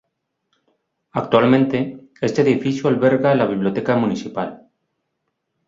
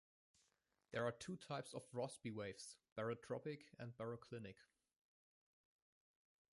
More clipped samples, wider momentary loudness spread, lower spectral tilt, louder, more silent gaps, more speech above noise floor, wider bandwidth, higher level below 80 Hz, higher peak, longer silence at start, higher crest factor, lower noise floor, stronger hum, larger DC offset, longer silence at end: neither; first, 12 LU vs 9 LU; first, -7 dB/octave vs -5 dB/octave; first, -18 LUFS vs -50 LUFS; second, none vs 2.92-2.96 s; first, 57 dB vs 36 dB; second, 7.6 kHz vs 11.5 kHz; first, -60 dBFS vs -82 dBFS; first, -2 dBFS vs -30 dBFS; first, 1.15 s vs 0.9 s; about the same, 18 dB vs 22 dB; second, -75 dBFS vs -86 dBFS; neither; neither; second, 1.1 s vs 1.9 s